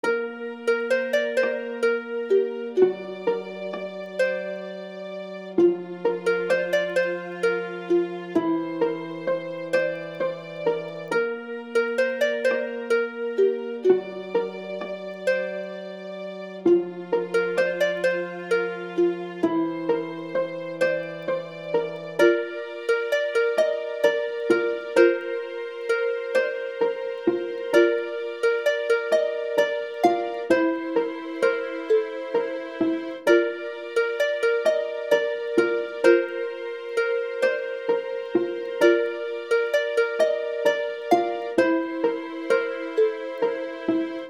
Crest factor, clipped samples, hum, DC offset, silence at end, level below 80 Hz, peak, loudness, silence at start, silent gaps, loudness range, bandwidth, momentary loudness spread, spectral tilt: 20 dB; under 0.1%; none; under 0.1%; 0 s; -74 dBFS; -4 dBFS; -25 LUFS; 0.05 s; none; 3 LU; 13 kHz; 9 LU; -5 dB/octave